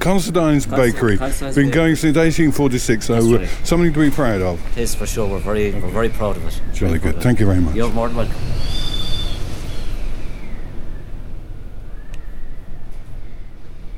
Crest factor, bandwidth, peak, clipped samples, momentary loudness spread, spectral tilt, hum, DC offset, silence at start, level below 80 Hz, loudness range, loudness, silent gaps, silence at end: 16 dB; 16 kHz; -2 dBFS; under 0.1%; 22 LU; -6 dB/octave; none; under 0.1%; 0 s; -24 dBFS; 18 LU; -18 LUFS; none; 0 s